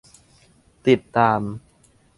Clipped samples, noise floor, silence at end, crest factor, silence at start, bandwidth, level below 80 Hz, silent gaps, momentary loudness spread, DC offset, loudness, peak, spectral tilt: under 0.1%; -57 dBFS; 0.6 s; 22 dB; 0.85 s; 11.5 kHz; -56 dBFS; none; 14 LU; under 0.1%; -20 LUFS; -2 dBFS; -7 dB/octave